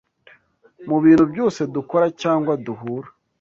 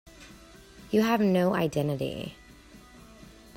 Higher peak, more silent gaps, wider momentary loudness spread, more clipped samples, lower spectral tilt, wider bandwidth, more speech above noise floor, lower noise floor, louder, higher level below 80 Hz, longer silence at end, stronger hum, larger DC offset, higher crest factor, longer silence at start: first, -4 dBFS vs -12 dBFS; neither; second, 16 LU vs 20 LU; neither; about the same, -7.5 dB/octave vs -6.5 dB/octave; second, 7.4 kHz vs 16 kHz; first, 36 dB vs 26 dB; about the same, -54 dBFS vs -52 dBFS; first, -19 LUFS vs -27 LUFS; about the same, -56 dBFS vs -56 dBFS; about the same, 0.3 s vs 0.25 s; neither; neither; about the same, 16 dB vs 18 dB; first, 0.8 s vs 0.2 s